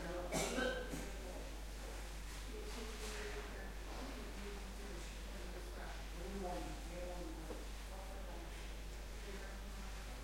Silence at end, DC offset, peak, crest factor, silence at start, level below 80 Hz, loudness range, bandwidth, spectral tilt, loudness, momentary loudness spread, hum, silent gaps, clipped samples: 0 s; under 0.1%; -26 dBFS; 20 dB; 0 s; -50 dBFS; 4 LU; 16.5 kHz; -4 dB/octave; -47 LUFS; 9 LU; none; none; under 0.1%